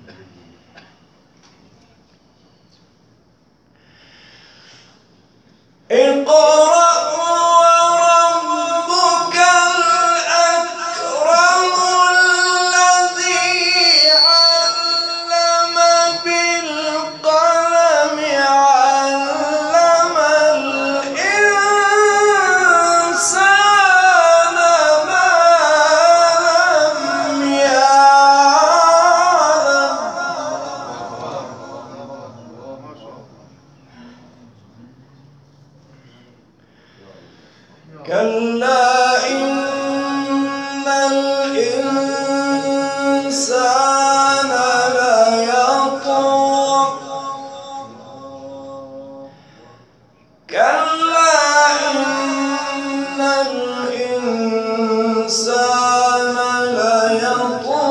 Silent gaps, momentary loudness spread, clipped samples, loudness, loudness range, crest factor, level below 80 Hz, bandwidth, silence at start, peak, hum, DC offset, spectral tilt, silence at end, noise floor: none; 12 LU; under 0.1%; -13 LUFS; 9 LU; 14 dB; -68 dBFS; 11.5 kHz; 5.9 s; 0 dBFS; none; under 0.1%; -1 dB/octave; 0 s; -55 dBFS